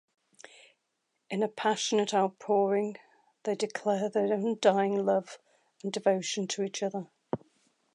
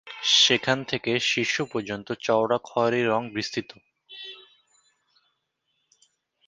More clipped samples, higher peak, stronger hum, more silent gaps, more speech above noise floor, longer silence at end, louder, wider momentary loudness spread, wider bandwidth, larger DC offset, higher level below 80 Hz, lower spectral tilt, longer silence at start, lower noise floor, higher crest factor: neither; second, -10 dBFS vs -4 dBFS; neither; neither; about the same, 51 dB vs 51 dB; second, 0.6 s vs 2.05 s; second, -30 LUFS vs -23 LUFS; second, 13 LU vs 17 LU; about the same, 11 kHz vs 10 kHz; neither; second, -80 dBFS vs -66 dBFS; first, -4.5 dB/octave vs -3 dB/octave; first, 1.3 s vs 0.05 s; first, -80 dBFS vs -76 dBFS; about the same, 20 dB vs 24 dB